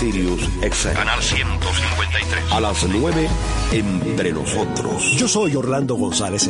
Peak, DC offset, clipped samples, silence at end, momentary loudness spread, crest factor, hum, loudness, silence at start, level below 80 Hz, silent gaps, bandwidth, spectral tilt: -4 dBFS; under 0.1%; under 0.1%; 0 s; 4 LU; 16 dB; none; -19 LUFS; 0 s; -28 dBFS; none; 11 kHz; -4 dB/octave